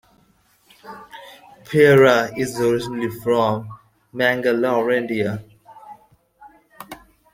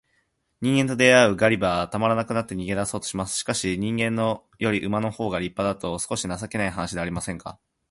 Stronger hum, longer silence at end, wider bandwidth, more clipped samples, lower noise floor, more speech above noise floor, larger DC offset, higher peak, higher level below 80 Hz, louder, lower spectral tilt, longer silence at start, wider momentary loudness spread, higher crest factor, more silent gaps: neither; about the same, 0.4 s vs 0.4 s; first, 16.5 kHz vs 11.5 kHz; neither; second, -59 dBFS vs -70 dBFS; second, 41 dB vs 46 dB; neither; about the same, -2 dBFS vs -4 dBFS; second, -58 dBFS vs -50 dBFS; first, -18 LUFS vs -24 LUFS; first, -6 dB/octave vs -4.5 dB/octave; first, 0.85 s vs 0.6 s; first, 26 LU vs 11 LU; about the same, 20 dB vs 20 dB; neither